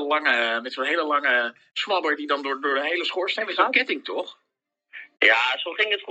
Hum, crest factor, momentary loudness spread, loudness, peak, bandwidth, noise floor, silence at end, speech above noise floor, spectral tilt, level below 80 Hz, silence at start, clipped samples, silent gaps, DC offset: none; 22 dB; 10 LU; -22 LUFS; -2 dBFS; 8.8 kHz; -79 dBFS; 0 s; 55 dB; -1.5 dB/octave; under -90 dBFS; 0 s; under 0.1%; none; under 0.1%